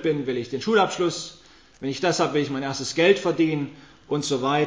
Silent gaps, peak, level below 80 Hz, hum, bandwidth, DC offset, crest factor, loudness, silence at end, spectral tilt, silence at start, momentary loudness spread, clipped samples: none; -4 dBFS; -64 dBFS; none; 8 kHz; 0.1%; 20 dB; -24 LUFS; 0 s; -4.5 dB/octave; 0 s; 12 LU; under 0.1%